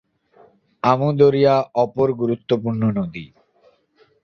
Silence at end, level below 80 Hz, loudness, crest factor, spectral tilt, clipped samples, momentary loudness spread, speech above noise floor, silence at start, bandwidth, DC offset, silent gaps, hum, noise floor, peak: 1 s; -56 dBFS; -19 LUFS; 18 dB; -8.5 dB/octave; under 0.1%; 10 LU; 41 dB; 0.85 s; 6.6 kHz; under 0.1%; none; none; -59 dBFS; -2 dBFS